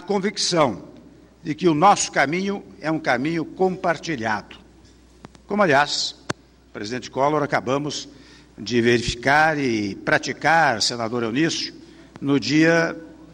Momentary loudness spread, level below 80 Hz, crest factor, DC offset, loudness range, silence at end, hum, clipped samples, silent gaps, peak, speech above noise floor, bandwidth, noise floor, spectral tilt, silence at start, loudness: 14 LU; -52 dBFS; 16 dB; under 0.1%; 4 LU; 0.1 s; none; under 0.1%; none; -6 dBFS; 29 dB; 15.5 kHz; -50 dBFS; -4 dB/octave; 0 s; -21 LUFS